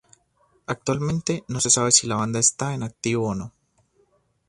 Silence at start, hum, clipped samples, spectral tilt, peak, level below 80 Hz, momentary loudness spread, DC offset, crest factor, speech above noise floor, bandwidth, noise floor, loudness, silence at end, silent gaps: 0.7 s; none; under 0.1%; -3 dB/octave; -2 dBFS; -54 dBFS; 15 LU; under 0.1%; 24 dB; 41 dB; 11.5 kHz; -65 dBFS; -22 LUFS; 1 s; none